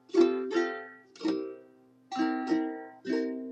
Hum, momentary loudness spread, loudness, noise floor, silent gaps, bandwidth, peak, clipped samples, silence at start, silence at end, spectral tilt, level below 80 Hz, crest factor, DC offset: none; 15 LU; -31 LUFS; -59 dBFS; none; 8.2 kHz; -12 dBFS; under 0.1%; 0.1 s; 0 s; -5 dB/octave; -86 dBFS; 20 dB; under 0.1%